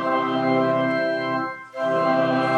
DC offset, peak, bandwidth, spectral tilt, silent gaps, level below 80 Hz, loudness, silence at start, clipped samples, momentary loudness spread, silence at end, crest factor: under 0.1%; -8 dBFS; 10 kHz; -7 dB/octave; none; -76 dBFS; -22 LUFS; 0 s; under 0.1%; 7 LU; 0 s; 14 dB